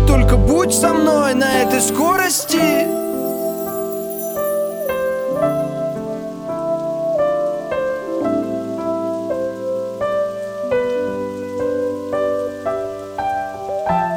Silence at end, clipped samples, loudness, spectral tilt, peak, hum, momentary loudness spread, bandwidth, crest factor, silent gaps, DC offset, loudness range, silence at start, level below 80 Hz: 0 s; under 0.1%; -19 LUFS; -4.5 dB/octave; 0 dBFS; none; 9 LU; over 20 kHz; 18 dB; none; under 0.1%; 6 LU; 0 s; -28 dBFS